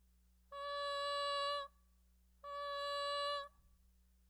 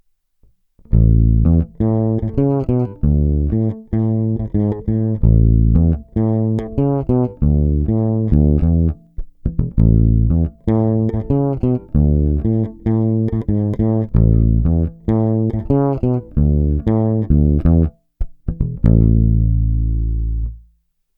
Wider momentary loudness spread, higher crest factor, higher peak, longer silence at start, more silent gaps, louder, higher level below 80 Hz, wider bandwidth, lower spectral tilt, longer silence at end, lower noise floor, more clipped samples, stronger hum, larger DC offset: first, 15 LU vs 7 LU; about the same, 16 dB vs 16 dB; second, -30 dBFS vs 0 dBFS; second, 0.5 s vs 0.9 s; neither; second, -41 LUFS vs -17 LUFS; second, -72 dBFS vs -20 dBFS; first, over 20 kHz vs 2.4 kHz; second, 0 dB/octave vs -13 dB/octave; first, 0.8 s vs 0.6 s; first, -71 dBFS vs -60 dBFS; neither; first, 60 Hz at -70 dBFS vs none; neither